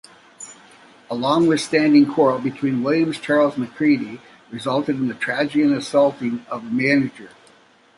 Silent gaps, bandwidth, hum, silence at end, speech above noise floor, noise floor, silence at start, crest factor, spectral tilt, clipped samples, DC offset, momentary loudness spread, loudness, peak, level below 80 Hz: none; 11.5 kHz; none; 0.7 s; 34 dB; -53 dBFS; 0.4 s; 16 dB; -5.5 dB/octave; under 0.1%; under 0.1%; 16 LU; -19 LUFS; -4 dBFS; -64 dBFS